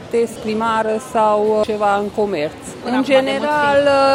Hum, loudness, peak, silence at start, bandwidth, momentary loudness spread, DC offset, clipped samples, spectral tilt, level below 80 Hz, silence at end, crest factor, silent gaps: none; -17 LUFS; -2 dBFS; 0 s; 15.5 kHz; 7 LU; under 0.1%; under 0.1%; -4.5 dB/octave; -52 dBFS; 0 s; 14 dB; none